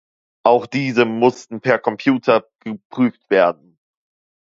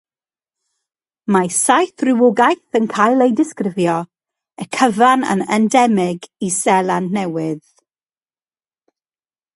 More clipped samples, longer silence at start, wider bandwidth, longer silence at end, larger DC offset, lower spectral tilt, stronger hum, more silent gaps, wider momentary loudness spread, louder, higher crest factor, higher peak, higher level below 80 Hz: neither; second, 0.45 s vs 1.3 s; second, 7.6 kHz vs 11.5 kHz; second, 1.05 s vs 2 s; neither; first, -6.5 dB/octave vs -4.5 dB/octave; neither; first, 2.85-2.90 s vs none; about the same, 11 LU vs 11 LU; about the same, -18 LUFS vs -16 LUFS; about the same, 18 dB vs 18 dB; about the same, 0 dBFS vs 0 dBFS; about the same, -66 dBFS vs -64 dBFS